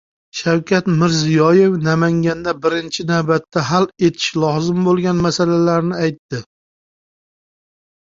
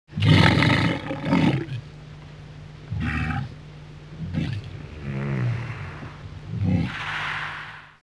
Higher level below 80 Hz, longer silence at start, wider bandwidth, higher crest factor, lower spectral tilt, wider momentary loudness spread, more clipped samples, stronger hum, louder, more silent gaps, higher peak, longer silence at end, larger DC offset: second, -52 dBFS vs -42 dBFS; first, 0.35 s vs 0.1 s; second, 7.6 kHz vs 11 kHz; second, 16 dB vs 24 dB; about the same, -6 dB/octave vs -6.5 dB/octave; second, 8 LU vs 23 LU; neither; neither; first, -16 LUFS vs -24 LUFS; first, 6.19-6.29 s vs none; about the same, -2 dBFS vs 0 dBFS; first, 1.6 s vs 0.15 s; neither